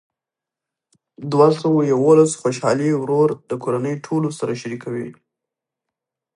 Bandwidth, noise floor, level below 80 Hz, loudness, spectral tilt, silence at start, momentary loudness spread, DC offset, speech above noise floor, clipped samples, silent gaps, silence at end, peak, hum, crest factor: 11 kHz; -87 dBFS; -68 dBFS; -18 LUFS; -6.5 dB/octave; 1.2 s; 13 LU; under 0.1%; 69 dB; under 0.1%; none; 1.25 s; -2 dBFS; none; 18 dB